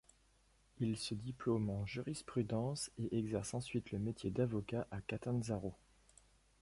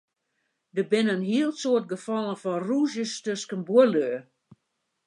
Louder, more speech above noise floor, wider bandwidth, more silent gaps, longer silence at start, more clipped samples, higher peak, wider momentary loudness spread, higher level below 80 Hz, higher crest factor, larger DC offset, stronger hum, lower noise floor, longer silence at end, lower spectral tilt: second, -41 LUFS vs -26 LUFS; second, 32 dB vs 54 dB; about the same, 11.5 kHz vs 11 kHz; neither; about the same, 0.75 s vs 0.75 s; neither; second, -24 dBFS vs -6 dBFS; second, 5 LU vs 11 LU; first, -62 dBFS vs -80 dBFS; about the same, 18 dB vs 20 dB; neither; neither; second, -72 dBFS vs -78 dBFS; about the same, 0.85 s vs 0.85 s; about the same, -6 dB/octave vs -5 dB/octave